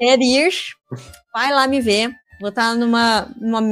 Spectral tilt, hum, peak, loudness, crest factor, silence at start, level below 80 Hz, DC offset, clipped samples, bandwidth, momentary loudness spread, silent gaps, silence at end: -3.5 dB/octave; none; 0 dBFS; -17 LUFS; 16 dB; 0 s; -54 dBFS; under 0.1%; under 0.1%; 15.5 kHz; 15 LU; none; 0 s